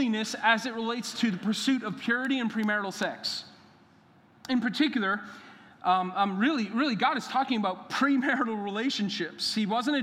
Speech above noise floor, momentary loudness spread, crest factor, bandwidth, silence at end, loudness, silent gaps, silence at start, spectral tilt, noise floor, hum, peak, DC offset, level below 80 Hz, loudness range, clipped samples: 31 dB; 6 LU; 20 dB; 15 kHz; 0 s; -28 LUFS; none; 0 s; -4 dB/octave; -59 dBFS; none; -8 dBFS; under 0.1%; -80 dBFS; 3 LU; under 0.1%